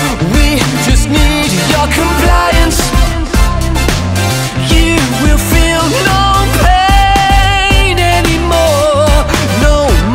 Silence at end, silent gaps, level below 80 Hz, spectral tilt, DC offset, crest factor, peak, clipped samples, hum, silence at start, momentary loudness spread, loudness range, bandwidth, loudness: 0 s; none; -14 dBFS; -4.5 dB/octave; under 0.1%; 8 dB; 0 dBFS; 0.4%; none; 0 s; 4 LU; 2 LU; 16.5 kHz; -10 LUFS